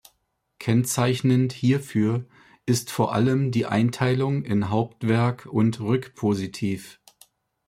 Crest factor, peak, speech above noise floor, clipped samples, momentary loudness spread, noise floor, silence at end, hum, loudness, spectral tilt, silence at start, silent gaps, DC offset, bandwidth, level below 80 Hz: 16 dB; -6 dBFS; 49 dB; under 0.1%; 6 LU; -72 dBFS; 0.75 s; none; -24 LUFS; -6.5 dB/octave; 0.6 s; none; under 0.1%; 15.5 kHz; -60 dBFS